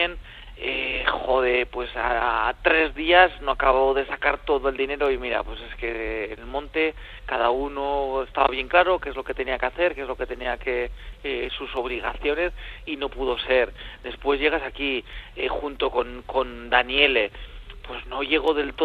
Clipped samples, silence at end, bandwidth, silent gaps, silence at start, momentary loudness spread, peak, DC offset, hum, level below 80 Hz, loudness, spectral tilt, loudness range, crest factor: under 0.1%; 0 s; 6.6 kHz; none; 0 s; 12 LU; 0 dBFS; under 0.1%; none; -40 dBFS; -24 LUFS; -5.5 dB/octave; 6 LU; 24 dB